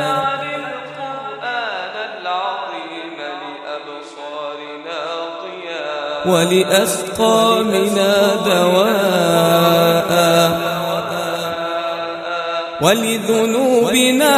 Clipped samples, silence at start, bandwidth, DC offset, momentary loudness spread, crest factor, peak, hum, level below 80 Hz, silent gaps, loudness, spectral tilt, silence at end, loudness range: under 0.1%; 0 s; 15.5 kHz; under 0.1%; 15 LU; 16 dB; 0 dBFS; none; -56 dBFS; none; -16 LUFS; -4 dB/octave; 0 s; 12 LU